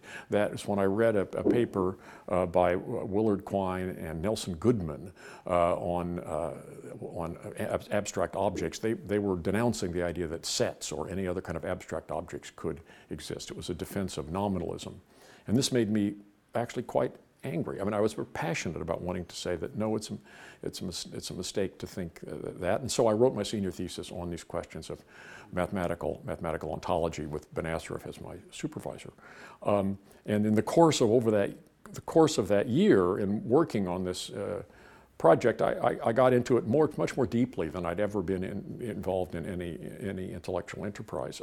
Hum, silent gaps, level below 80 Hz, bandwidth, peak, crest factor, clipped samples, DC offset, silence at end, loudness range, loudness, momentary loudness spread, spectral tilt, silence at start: none; none; -56 dBFS; 17 kHz; -8 dBFS; 22 dB; under 0.1%; under 0.1%; 0 s; 9 LU; -30 LUFS; 15 LU; -5.5 dB/octave; 0.05 s